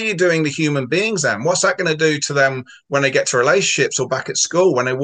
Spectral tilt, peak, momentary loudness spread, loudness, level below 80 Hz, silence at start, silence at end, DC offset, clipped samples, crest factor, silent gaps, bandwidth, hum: -3.5 dB/octave; -2 dBFS; 4 LU; -17 LUFS; -64 dBFS; 0 s; 0 s; under 0.1%; under 0.1%; 16 dB; none; 10 kHz; none